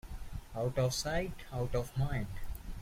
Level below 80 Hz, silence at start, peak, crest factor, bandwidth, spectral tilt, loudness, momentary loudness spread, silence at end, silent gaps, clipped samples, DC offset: -44 dBFS; 0.05 s; -20 dBFS; 16 dB; 16.5 kHz; -5 dB/octave; -36 LUFS; 14 LU; 0 s; none; under 0.1%; under 0.1%